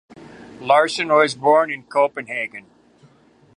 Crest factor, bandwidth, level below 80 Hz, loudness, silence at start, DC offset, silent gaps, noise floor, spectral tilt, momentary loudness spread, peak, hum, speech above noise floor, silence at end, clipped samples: 20 dB; 11 kHz; -68 dBFS; -18 LUFS; 0.2 s; under 0.1%; none; -54 dBFS; -3.5 dB/octave; 13 LU; -2 dBFS; none; 36 dB; 0.95 s; under 0.1%